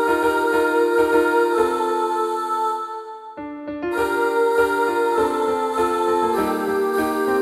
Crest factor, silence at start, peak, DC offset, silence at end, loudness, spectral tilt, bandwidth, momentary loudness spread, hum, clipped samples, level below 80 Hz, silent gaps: 14 dB; 0 s; -6 dBFS; under 0.1%; 0 s; -20 LUFS; -4.5 dB/octave; 15 kHz; 11 LU; none; under 0.1%; -52 dBFS; none